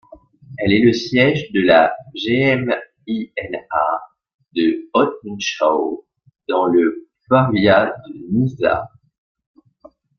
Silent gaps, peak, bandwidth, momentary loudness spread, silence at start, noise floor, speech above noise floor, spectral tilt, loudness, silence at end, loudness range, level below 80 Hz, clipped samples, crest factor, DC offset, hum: 4.34-4.39 s; 0 dBFS; 7 kHz; 13 LU; 0.5 s; -49 dBFS; 32 dB; -6 dB/octave; -18 LUFS; 1.3 s; 4 LU; -54 dBFS; under 0.1%; 18 dB; under 0.1%; none